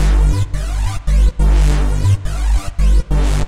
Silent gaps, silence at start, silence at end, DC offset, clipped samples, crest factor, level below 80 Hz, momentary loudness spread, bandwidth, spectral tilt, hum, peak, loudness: none; 0 s; 0 s; 3%; under 0.1%; 10 dB; -14 dBFS; 6 LU; 11.5 kHz; -6 dB/octave; none; -4 dBFS; -17 LUFS